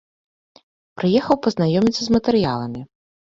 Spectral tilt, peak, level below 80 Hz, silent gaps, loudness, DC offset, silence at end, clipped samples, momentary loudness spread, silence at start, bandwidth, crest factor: -6.5 dB/octave; -2 dBFS; -50 dBFS; none; -19 LUFS; under 0.1%; 0.5 s; under 0.1%; 9 LU; 0.95 s; 7.8 kHz; 18 dB